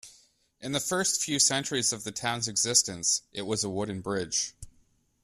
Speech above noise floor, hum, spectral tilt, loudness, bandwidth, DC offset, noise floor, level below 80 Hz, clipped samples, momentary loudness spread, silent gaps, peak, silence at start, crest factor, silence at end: 37 dB; none; -2 dB/octave; -27 LUFS; 15.5 kHz; under 0.1%; -66 dBFS; -62 dBFS; under 0.1%; 10 LU; none; -8 dBFS; 0.05 s; 24 dB; 0.55 s